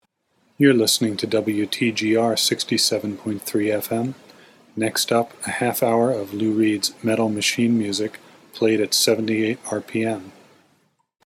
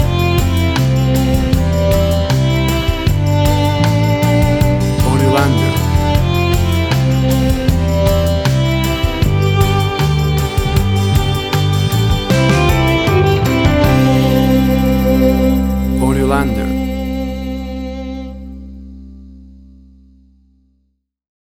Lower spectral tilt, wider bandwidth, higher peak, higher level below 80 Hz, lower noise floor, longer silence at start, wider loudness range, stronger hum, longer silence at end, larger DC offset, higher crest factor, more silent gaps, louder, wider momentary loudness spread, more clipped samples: second, -3.5 dB/octave vs -6.5 dB/octave; second, 17 kHz vs 19.5 kHz; about the same, -2 dBFS vs 0 dBFS; second, -74 dBFS vs -22 dBFS; about the same, -66 dBFS vs -64 dBFS; first, 0.6 s vs 0 s; second, 3 LU vs 9 LU; neither; second, 1 s vs 2.05 s; neither; first, 18 dB vs 12 dB; neither; second, -21 LUFS vs -14 LUFS; about the same, 9 LU vs 8 LU; neither